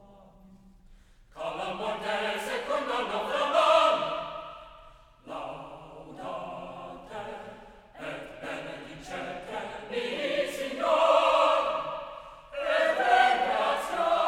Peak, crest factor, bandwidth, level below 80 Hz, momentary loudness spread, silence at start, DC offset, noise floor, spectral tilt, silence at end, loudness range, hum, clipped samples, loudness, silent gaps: -10 dBFS; 20 dB; 15.5 kHz; -60 dBFS; 20 LU; 0.2 s; under 0.1%; -55 dBFS; -3 dB/octave; 0 s; 15 LU; none; under 0.1%; -28 LUFS; none